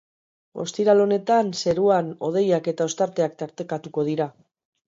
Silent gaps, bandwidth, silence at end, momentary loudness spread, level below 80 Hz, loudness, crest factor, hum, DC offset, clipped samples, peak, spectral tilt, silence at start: none; 7.8 kHz; 0.6 s; 12 LU; -66 dBFS; -23 LUFS; 18 dB; none; under 0.1%; under 0.1%; -6 dBFS; -5.5 dB/octave; 0.55 s